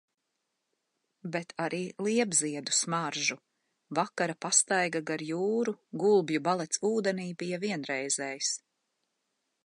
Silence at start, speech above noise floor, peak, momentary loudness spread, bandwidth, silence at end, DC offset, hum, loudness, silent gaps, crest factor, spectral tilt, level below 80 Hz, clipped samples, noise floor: 1.25 s; 52 dB; -10 dBFS; 10 LU; 11.5 kHz; 1.05 s; under 0.1%; none; -30 LUFS; none; 22 dB; -3 dB/octave; -82 dBFS; under 0.1%; -82 dBFS